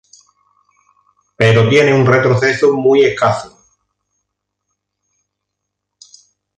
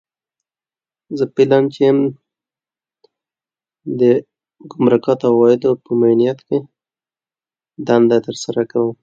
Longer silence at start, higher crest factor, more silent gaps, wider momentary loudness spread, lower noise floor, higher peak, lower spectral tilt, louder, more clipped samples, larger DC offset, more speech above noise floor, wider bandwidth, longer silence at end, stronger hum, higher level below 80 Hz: first, 1.4 s vs 1.1 s; about the same, 16 dB vs 16 dB; neither; second, 6 LU vs 9 LU; second, -77 dBFS vs under -90 dBFS; about the same, 0 dBFS vs 0 dBFS; about the same, -6 dB/octave vs -7 dB/octave; first, -12 LUFS vs -15 LUFS; neither; neither; second, 66 dB vs over 75 dB; first, 9.6 kHz vs 7.6 kHz; first, 3.1 s vs 0.1 s; first, 50 Hz at -50 dBFS vs none; first, -52 dBFS vs -64 dBFS